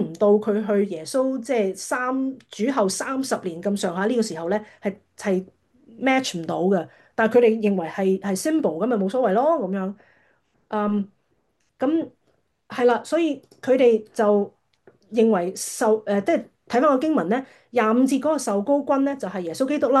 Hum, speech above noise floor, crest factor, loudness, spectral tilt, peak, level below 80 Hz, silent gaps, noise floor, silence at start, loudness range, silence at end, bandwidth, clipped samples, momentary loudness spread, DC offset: none; 48 dB; 16 dB; -22 LUFS; -5.5 dB/octave; -6 dBFS; -70 dBFS; none; -69 dBFS; 0 s; 4 LU; 0 s; 12.5 kHz; under 0.1%; 8 LU; under 0.1%